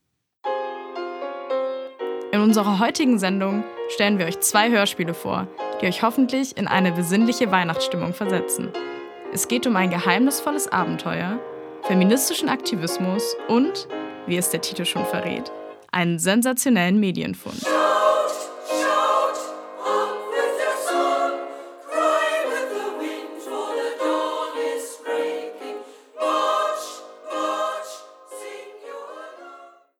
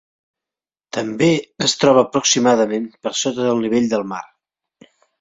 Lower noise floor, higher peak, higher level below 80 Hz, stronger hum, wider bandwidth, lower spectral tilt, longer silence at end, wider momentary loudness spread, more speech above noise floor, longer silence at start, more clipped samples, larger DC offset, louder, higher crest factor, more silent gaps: second, -46 dBFS vs -90 dBFS; about the same, 0 dBFS vs -2 dBFS; second, -68 dBFS vs -60 dBFS; neither; first, 18 kHz vs 8 kHz; about the same, -4 dB/octave vs -3.5 dB/octave; second, 0.3 s vs 0.95 s; first, 15 LU vs 11 LU; second, 25 dB vs 73 dB; second, 0.45 s vs 0.95 s; neither; neither; second, -22 LUFS vs -17 LUFS; about the same, 22 dB vs 18 dB; neither